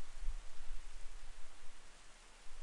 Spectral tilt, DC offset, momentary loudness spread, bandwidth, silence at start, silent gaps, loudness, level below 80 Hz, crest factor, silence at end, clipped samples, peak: -3 dB/octave; under 0.1%; 9 LU; 11 kHz; 0 s; none; -57 LUFS; -48 dBFS; 14 dB; 0 s; under 0.1%; -26 dBFS